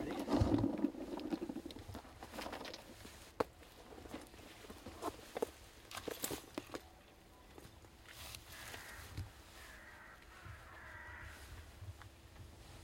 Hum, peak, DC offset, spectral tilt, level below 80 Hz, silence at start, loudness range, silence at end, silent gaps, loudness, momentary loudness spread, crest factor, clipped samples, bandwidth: none; -18 dBFS; under 0.1%; -5.5 dB/octave; -58 dBFS; 0 s; 10 LU; 0 s; none; -45 LUFS; 19 LU; 28 dB; under 0.1%; 16.5 kHz